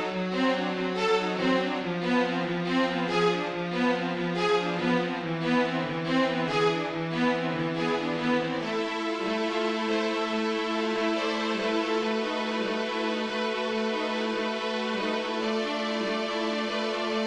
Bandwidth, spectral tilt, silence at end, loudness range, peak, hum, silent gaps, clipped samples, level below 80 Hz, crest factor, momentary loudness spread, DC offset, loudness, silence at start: 10.5 kHz; -5.5 dB/octave; 0 s; 2 LU; -12 dBFS; none; none; under 0.1%; -64 dBFS; 14 dB; 3 LU; under 0.1%; -28 LUFS; 0 s